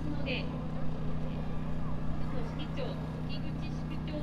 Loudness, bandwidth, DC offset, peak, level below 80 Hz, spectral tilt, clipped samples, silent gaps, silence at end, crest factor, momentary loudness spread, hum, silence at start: -37 LUFS; 7.2 kHz; under 0.1%; -20 dBFS; -42 dBFS; -7.5 dB/octave; under 0.1%; none; 0 s; 12 dB; 3 LU; none; 0 s